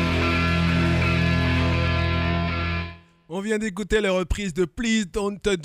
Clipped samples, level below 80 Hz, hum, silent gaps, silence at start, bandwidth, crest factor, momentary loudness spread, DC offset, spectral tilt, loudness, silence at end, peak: under 0.1%; -36 dBFS; none; none; 0 s; 11.5 kHz; 14 dB; 7 LU; under 0.1%; -6 dB/octave; -23 LUFS; 0 s; -8 dBFS